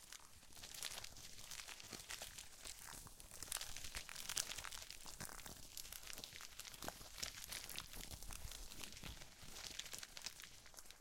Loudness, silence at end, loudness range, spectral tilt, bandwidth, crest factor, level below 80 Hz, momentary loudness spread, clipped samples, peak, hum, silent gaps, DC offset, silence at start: -50 LUFS; 0 s; 3 LU; -0.5 dB/octave; 17 kHz; 36 dB; -62 dBFS; 9 LU; under 0.1%; -16 dBFS; none; none; under 0.1%; 0 s